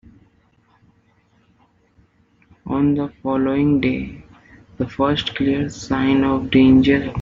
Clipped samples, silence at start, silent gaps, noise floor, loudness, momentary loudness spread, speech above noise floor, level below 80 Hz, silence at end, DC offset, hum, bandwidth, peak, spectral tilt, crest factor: under 0.1%; 2.65 s; none; -59 dBFS; -18 LUFS; 14 LU; 41 dB; -44 dBFS; 0 s; under 0.1%; none; 7.6 kHz; -2 dBFS; -5.5 dB/octave; 16 dB